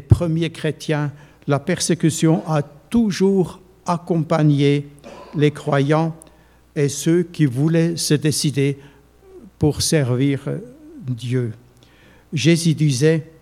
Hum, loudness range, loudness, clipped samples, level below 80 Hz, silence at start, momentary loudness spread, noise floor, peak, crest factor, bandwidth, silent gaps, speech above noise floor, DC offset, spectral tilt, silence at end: none; 3 LU; -19 LUFS; under 0.1%; -44 dBFS; 0.1 s; 13 LU; -50 dBFS; -2 dBFS; 18 dB; 15.5 kHz; none; 32 dB; under 0.1%; -6 dB/octave; 0.15 s